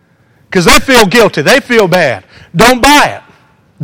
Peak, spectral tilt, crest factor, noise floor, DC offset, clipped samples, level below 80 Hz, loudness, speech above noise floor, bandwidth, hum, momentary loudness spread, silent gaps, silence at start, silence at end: 0 dBFS; -3.5 dB/octave; 8 dB; -48 dBFS; under 0.1%; 2%; -28 dBFS; -7 LUFS; 41 dB; over 20 kHz; none; 9 LU; none; 0.5 s; 0 s